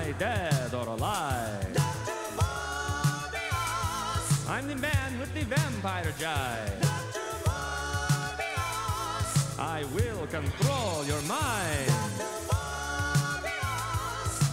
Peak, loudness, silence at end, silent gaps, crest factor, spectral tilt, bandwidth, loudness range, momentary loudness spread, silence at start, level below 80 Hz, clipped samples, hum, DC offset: -14 dBFS; -30 LUFS; 0 s; none; 16 dB; -4.5 dB/octave; 16 kHz; 1 LU; 4 LU; 0 s; -44 dBFS; under 0.1%; none; under 0.1%